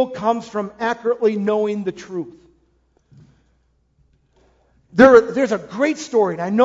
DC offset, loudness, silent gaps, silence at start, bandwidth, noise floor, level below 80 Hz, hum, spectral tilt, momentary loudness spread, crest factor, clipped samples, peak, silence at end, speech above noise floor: under 0.1%; -18 LUFS; none; 0 s; 7.8 kHz; -62 dBFS; -56 dBFS; none; -6 dB/octave; 17 LU; 20 dB; under 0.1%; 0 dBFS; 0 s; 45 dB